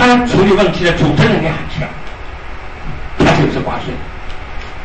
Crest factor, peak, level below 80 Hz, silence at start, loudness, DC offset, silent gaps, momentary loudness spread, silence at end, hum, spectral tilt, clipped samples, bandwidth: 12 dB; -2 dBFS; -26 dBFS; 0 s; -13 LUFS; 3%; none; 19 LU; 0 s; none; -6 dB/octave; under 0.1%; 8.8 kHz